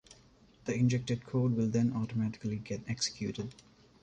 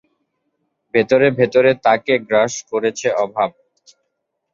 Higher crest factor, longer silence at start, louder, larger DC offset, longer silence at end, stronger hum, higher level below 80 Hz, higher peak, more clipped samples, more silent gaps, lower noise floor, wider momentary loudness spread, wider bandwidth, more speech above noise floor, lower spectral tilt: about the same, 16 dB vs 18 dB; second, 0.1 s vs 0.95 s; second, -33 LUFS vs -17 LUFS; neither; second, 0.5 s vs 1.05 s; neither; about the same, -62 dBFS vs -62 dBFS; second, -18 dBFS vs 0 dBFS; neither; neither; second, -62 dBFS vs -74 dBFS; about the same, 9 LU vs 7 LU; first, 9.2 kHz vs 7.6 kHz; second, 29 dB vs 58 dB; first, -6 dB/octave vs -4.5 dB/octave